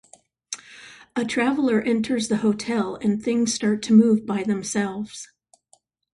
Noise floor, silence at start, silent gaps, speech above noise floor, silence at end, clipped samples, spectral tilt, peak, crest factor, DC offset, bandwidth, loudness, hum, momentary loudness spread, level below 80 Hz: -62 dBFS; 0.5 s; none; 41 dB; 0.9 s; under 0.1%; -5 dB/octave; -6 dBFS; 18 dB; under 0.1%; 11.5 kHz; -22 LUFS; none; 18 LU; -62 dBFS